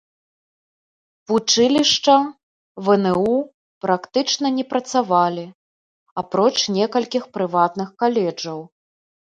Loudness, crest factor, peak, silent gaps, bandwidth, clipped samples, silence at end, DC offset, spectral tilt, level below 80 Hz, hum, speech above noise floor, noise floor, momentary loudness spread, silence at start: -19 LUFS; 18 dB; -2 dBFS; 2.43-2.75 s, 3.54-3.81 s, 5.55-6.06 s, 6.12-6.16 s; 11 kHz; under 0.1%; 0.7 s; under 0.1%; -4 dB/octave; -64 dBFS; none; over 71 dB; under -90 dBFS; 14 LU; 1.3 s